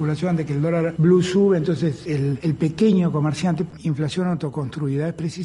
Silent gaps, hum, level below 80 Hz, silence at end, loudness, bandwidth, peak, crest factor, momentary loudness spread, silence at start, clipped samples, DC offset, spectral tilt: none; none; -52 dBFS; 0 s; -21 LUFS; 11 kHz; -6 dBFS; 14 dB; 8 LU; 0 s; under 0.1%; under 0.1%; -7.5 dB/octave